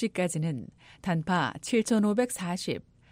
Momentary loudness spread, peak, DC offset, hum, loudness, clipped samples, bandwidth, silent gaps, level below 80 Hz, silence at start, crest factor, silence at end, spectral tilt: 13 LU; -14 dBFS; under 0.1%; none; -29 LUFS; under 0.1%; 16 kHz; none; -64 dBFS; 0 s; 16 dB; 0.3 s; -5.5 dB/octave